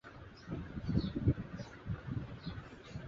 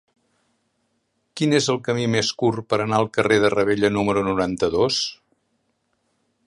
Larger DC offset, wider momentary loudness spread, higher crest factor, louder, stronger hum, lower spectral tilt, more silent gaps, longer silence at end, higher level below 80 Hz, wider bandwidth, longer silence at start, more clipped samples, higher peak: neither; first, 14 LU vs 6 LU; about the same, 20 dB vs 20 dB; second, -40 LUFS vs -21 LUFS; neither; first, -7.5 dB/octave vs -4.5 dB/octave; neither; second, 0 s vs 1.35 s; about the same, -50 dBFS vs -52 dBFS; second, 7.2 kHz vs 11.5 kHz; second, 0.05 s vs 1.35 s; neither; second, -20 dBFS vs -4 dBFS